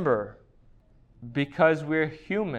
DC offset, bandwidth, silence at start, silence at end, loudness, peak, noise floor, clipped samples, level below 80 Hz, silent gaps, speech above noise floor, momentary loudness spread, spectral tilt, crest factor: under 0.1%; 9.2 kHz; 0 s; 0 s; -26 LUFS; -8 dBFS; -57 dBFS; under 0.1%; -58 dBFS; none; 31 dB; 15 LU; -7.5 dB/octave; 20 dB